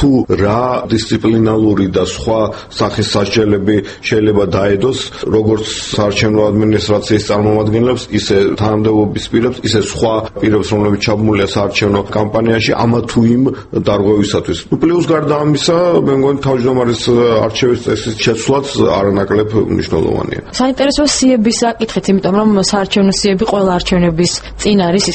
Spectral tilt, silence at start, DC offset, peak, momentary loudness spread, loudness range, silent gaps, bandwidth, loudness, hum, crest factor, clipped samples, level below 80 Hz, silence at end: -5.5 dB/octave; 0 s; under 0.1%; 0 dBFS; 4 LU; 1 LU; none; 8.8 kHz; -13 LUFS; none; 12 dB; under 0.1%; -34 dBFS; 0 s